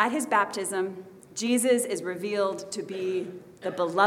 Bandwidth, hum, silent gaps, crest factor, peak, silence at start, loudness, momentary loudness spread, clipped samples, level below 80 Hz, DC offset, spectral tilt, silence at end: 17 kHz; none; none; 20 dB; -8 dBFS; 0 s; -28 LUFS; 12 LU; under 0.1%; -76 dBFS; under 0.1%; -3.5 dB/octave; 0 s